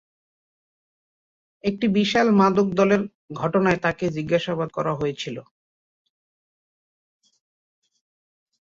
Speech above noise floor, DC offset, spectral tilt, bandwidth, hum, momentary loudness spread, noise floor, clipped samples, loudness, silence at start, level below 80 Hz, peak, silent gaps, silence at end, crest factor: over 69 dB; under 0.1%; -6.5 dB/octave; 7.6 kHz; none; 11 LU; under -90 dBFS; under 0.1%; -22 LUFS; 1.65 s; -58 dBFS; -6 dBFS; 3.15-3.28 s; 3.2 s; 20 dB